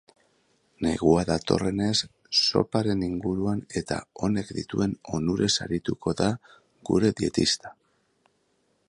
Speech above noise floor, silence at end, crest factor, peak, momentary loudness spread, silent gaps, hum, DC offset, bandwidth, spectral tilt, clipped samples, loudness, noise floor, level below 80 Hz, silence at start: 45 dB; 1.15 s; 22 dB; -4 dBFS; 8 LU; none; none; under 0.1%; 11.5 kHz; -5 dB/octave; under 0.1%; -26 LUFS; -70 dBFS; -50 dBFS; 0.8 s